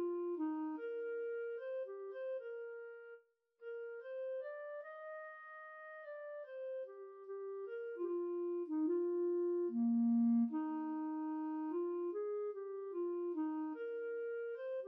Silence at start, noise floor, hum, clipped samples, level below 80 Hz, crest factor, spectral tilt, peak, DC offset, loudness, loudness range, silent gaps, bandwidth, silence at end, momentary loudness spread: 0 s; -64 dBFS; none; under 0.1%; under -90 dBFS; 12 dB; -7 dB/octave; -28 dBFS; under 0.1%; -41 LUFS; 12 LU; none; 3.3 kHz; 0 s; 14 LU